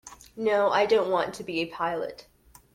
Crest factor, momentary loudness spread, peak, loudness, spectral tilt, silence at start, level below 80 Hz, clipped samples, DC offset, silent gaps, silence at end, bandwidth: 16 dB; 11 LU; -10 dBFS; -26 LUFS; -4.5 dB/octave; 0.05 s; -62 dBFS; under 0.1%; under 0.1%; none; 0.5 s; 15.5 kHz